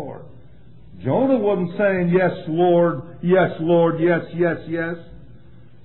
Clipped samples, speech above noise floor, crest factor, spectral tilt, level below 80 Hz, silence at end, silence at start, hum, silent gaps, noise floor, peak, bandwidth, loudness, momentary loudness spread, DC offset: under 0.1%; 29 dB; 14 dB; -12 dB/octave; -52 dBFS; 0.6 s; 0 s; none; none; -47 dBFS; -6 dBFS; 4.2 kHz; -19 LUFS; 11 LU; 0.8%